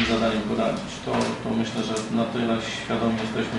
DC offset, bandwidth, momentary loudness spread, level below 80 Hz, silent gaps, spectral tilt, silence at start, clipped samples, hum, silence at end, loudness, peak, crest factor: under 0.1%; 11.5 kHz; 4 LU; -48 dBFS; none; -5 dB/octave; 0 s; under 0.1%; none; 0 s; -25 LUFS; -10 dBFS; 16 dB